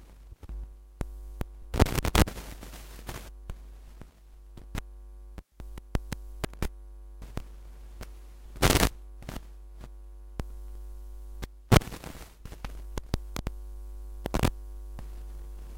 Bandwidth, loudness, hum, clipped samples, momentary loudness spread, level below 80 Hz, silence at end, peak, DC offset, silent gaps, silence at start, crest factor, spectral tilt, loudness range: 17 kHz; -32 LUFS; none; under 0.1%; 24 LU; -38 dBFS; 0 s; -4 dBFS; under 0.1%; none; 0 s; 30 dB; -4.5 dB/octave; 10 LU